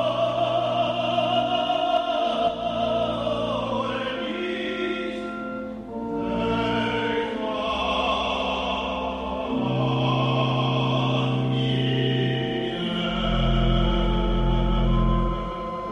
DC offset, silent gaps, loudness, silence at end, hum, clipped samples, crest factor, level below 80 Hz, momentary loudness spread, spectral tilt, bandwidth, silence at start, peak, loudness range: under 0.1%; none; -25 LUFS; 0 s; none; under 0.1%; 14 dB; -32 dBFS; 6 LU; -7 dB/octave; 9 kHz; 0 s; -10 dBFS; 4 LU